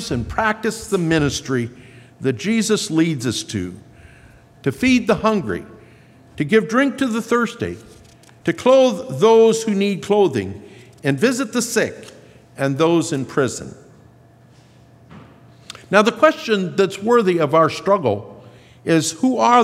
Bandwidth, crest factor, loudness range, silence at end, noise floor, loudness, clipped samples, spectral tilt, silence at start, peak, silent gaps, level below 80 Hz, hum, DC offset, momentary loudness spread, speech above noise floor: 15.5 kHz; 18 dB; 5 LU; 0 s; -48 dBFS; -18 LUFS; under 0.1%; -5 dB/octave; 0 s; 0 dBFS; none; -50 dBFS; none; under 0.1%; 13 LU; 31 dB